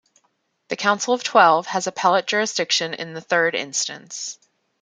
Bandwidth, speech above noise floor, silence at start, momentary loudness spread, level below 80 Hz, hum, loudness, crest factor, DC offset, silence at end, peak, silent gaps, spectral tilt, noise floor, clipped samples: 10 kHz; 48 dB; 0.7 s; 15 LU; -74 dBFS; none; -20 LUFS; 20 dB; under 0.1%; 0.5 s; -2 dBFS; none; -2 dB/octave; -69 dBFS; under 0.1%